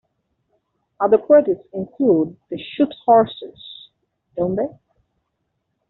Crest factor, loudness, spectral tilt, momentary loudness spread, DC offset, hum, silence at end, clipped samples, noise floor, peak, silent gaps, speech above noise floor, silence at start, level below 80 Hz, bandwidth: 18 dB; -18 LUFS; -5.5 dB/octave; 20 LU; under 0.1%; none; 1.2 s; under 0.1%; -74 dBFS; -2 dBFS; none; 56 dB; 1 s; -60 dBFS; 4.1 kHz